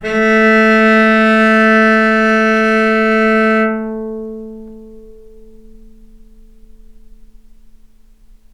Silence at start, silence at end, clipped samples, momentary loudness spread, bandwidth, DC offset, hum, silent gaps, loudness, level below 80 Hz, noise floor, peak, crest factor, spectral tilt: 0 s; 3.45 s; under 0.1%; 17 LU; 10 kHz; under 0.1%; none; none; -11 LUFS; -42 dBFS; -43 dBFS; 0 dBFS; 14 dB; -6 dB/octave